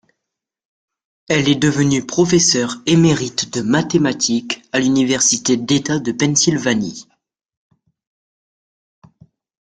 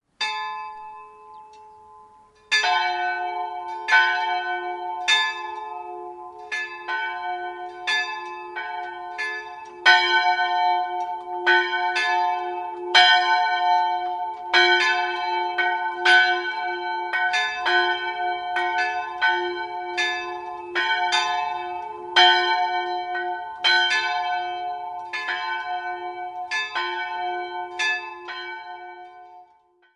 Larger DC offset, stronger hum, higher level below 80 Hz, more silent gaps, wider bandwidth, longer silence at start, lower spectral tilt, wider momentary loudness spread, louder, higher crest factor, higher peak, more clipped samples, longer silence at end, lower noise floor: neither; neither; first, -52 dBFS vs -70 dBFS; neither; second, 10 kHz vs 11.5 kHz; first, 1.3 s vs 0.2 s; first, -4 dB/octave vs 0 dB/octave; second, 7 LU vs 16 LU; first, -16 LUFS vs -22 LUFS; about the same, 18 dB vs 22 dB; about the same, -2 dBFS vs -2 dBFS; neither; first, 2.65 s vs 0.5 s; first, -81 dBFS vs -59 dBFS